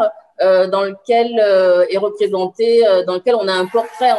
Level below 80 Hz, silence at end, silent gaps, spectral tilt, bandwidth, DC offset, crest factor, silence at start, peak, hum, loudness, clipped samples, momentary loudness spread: -70 dBFS; 0 s; none; -5 dB/octave; 11.5 kHz; under 0.1%; 12 dB; 0 s; -2 dBFS; none; -15 LUFS; under 0.1%; 6 LU